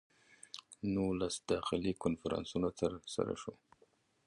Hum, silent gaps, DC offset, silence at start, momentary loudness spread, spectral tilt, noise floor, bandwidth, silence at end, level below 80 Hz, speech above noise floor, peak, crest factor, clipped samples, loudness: none; none; under 0.1%; 0.55 s; 13 LU; -5.5 dB/octave; -72 dBFS; 11.5 kHz; 0.75 s; -60 dBFS; 35 dB; -18 dBFS; 20 dB; under 0.1%; -38 LUFS